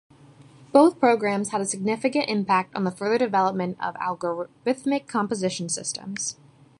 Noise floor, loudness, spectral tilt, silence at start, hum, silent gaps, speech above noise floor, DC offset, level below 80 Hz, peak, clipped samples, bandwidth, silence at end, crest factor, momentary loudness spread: -50 dBFS; -24 LUFS; -4.5 dB/octave; 0.6 s; none; none; 27 dB; under 0.1%; -70 dBFS; -4 dBFS; under 0.1%; 11.5 kHz; 0.45 s; 22 dB; 11 LU